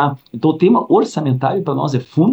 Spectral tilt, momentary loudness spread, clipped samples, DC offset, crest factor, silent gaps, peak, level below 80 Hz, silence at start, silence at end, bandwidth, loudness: -8 dB/octave; 6 LU; under 0.1%; under 0.1%; 14 dB; none; -2 dBFS; -64 dBFS; 0 s; 0 s; 8.4 kHz; -16 LUFS